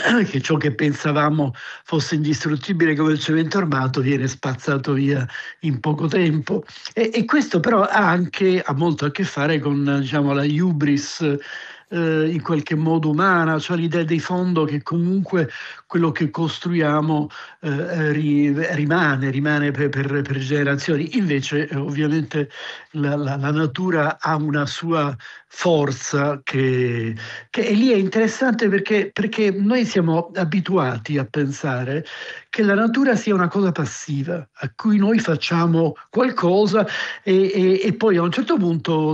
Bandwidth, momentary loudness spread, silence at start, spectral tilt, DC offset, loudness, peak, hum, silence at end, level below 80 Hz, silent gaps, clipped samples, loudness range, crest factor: 8.2 kHz; 8 LU; 0 s; -6.5 dB/octave; under 0.1%; -20 LUFS; -4 dBFS; none; 0 s; -66 dBFS; none; under 0.1%; 3 LU; 14 dB